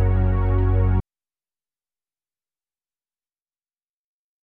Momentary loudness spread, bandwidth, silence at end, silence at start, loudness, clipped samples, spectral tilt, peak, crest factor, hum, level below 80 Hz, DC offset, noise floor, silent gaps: 3 LU; 3.4 kHz; 3.4 s; 0 s; -21 LUFS; under 0.1%; -12 dB/octave; -10 dBFS; 14 dB; none; -28 dBFS; under 0.1%; under -90 dBFS; none